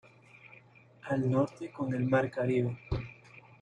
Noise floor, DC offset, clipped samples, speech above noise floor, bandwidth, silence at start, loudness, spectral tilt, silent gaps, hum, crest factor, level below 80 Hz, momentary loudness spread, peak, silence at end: -58 dBFS; under 0.1%; under 0.1%; 28 dB; 9.4 kHz; 0.45 s; -32 LUFS; -8.5 dB/octave; none; none; 18 dB; -54 dBFS; 22 LU; -14 dBFS; 0.25 s